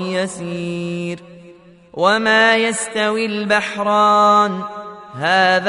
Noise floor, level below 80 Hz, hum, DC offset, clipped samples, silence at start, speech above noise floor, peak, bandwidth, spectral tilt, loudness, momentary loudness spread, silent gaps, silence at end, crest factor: -44 dBFS; -62 dBFS; none; under 0.1%; under 0.1%; 0 s; 27 dB; -2 dBFS; 11 kHz; -3.5 dB/octave; -16 LUFS; 16 LU; none; 0 s; 16 dB